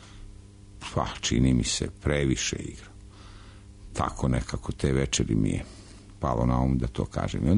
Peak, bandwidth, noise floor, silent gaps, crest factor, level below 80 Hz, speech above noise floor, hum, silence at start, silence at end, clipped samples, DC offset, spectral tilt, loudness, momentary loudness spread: -10 dBFS; 11 kHz; -47 dBFS; none; 16 dB; -38 dBFS; 21 dB; none; 0 s; 0 s; under 0.1%; under 0.1%; -5 dB/octave; -27 LUFS; 23 LU